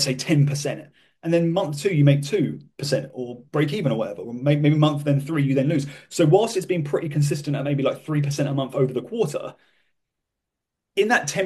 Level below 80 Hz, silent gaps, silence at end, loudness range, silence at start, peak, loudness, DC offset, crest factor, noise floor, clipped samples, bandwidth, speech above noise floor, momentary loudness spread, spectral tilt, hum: -64 dBFS; none; 0 s; 4 LU; 0 s; -4 dBFS; -22 LUFS; under 0.1%; 18 dB; -83 dBFS; under 0.1%; 12.5 kHz; 62 dB; 11 LU; -6 dB/octave; none